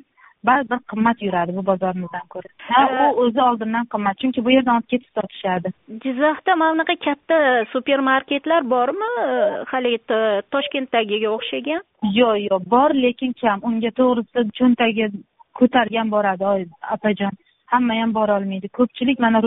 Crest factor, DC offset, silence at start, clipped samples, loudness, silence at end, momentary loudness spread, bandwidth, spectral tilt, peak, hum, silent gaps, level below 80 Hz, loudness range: 18 dB; under 0.1%; 0.45 s; under 0.1%; -19 LUFS; 0 s; 8 LU; 4 kHz; -3 dB/octave; -2 dBFS; none; none; -60 dBFS; 2 LU